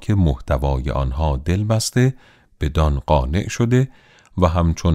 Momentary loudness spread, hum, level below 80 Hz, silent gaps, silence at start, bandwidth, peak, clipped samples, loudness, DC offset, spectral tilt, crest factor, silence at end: 5 LU; none; -26 dBFS; none; 0 s; 14.5 kHz; -2 dBFS; under 0.1%; -20 LUFS; under 0.1%; -6.5 dB/octave; 16 dB; 0 s